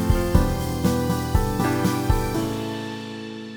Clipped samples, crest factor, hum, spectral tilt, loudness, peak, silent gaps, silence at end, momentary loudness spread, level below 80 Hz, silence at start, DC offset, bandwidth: under 0.1%; 18 dB; none; -6 dB/octave; -24 LUFS; -4 dBFS; none; 0 s; 11 LU; -28 dBFS; 0 s; under 0.1%; over 20 kHz